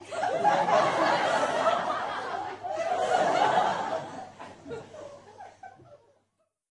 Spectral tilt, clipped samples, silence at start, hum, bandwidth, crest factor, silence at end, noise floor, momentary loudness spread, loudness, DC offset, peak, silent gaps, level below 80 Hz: -3.5 dB/octave; under 0.1%; 0 s; none; 11.5 kHz; 18 dB; 0.75 s; -76 dBFS; 22 LU; -27 LUFS; under 0.1%; -12 dBFS; none; -74 dBFS